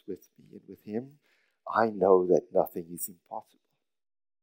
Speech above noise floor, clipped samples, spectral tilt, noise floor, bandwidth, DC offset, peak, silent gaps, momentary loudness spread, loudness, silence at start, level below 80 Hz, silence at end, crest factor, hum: 26 dB; under 0.1%; -6 dB/octave; -53 dBFS; 16 kHz; under 0.1%; -8 dBFS; none; 22 LU; -28 LUFS; 0.1 s; -76 dBFS; 1 s; 22 dB; none